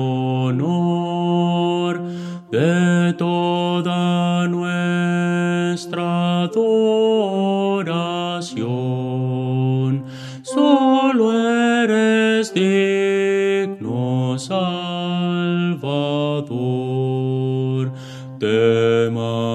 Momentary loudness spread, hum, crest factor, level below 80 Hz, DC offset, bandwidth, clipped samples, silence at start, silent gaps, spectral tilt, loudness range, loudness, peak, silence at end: 8 LU; none; 18 dB; -68 dBFS; under 0.1%; 10.5 kHz; under 0.1%; 0 s; none; -6.5 dB/octave; 5 LU; -19 LUFS; 0 dBFS; 0 s